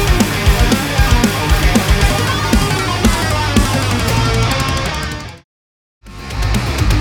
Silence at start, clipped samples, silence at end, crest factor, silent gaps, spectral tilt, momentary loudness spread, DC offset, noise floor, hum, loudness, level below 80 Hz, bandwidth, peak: 0 s; under 0.1%; 0 s; 14 dB; 5.44-6.01 s; -4.5 dB/octave; 8 LU; under 0.1%; under -90 dBFS; none; -14 LUFS; -18 dBFS; 20 kHz; 0 dBFS